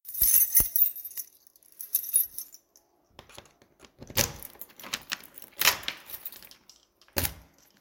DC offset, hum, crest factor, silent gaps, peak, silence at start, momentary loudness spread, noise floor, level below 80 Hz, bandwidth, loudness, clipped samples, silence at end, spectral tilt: under 0.1%; none; 28 dB; none; -4 dBFS; 0.05 s; 23 LU; -65 dBFS; -52 dBFS; 17 kHz; -25 LUFS; under 0.1%; 0.4 s; -0.5 dB/octave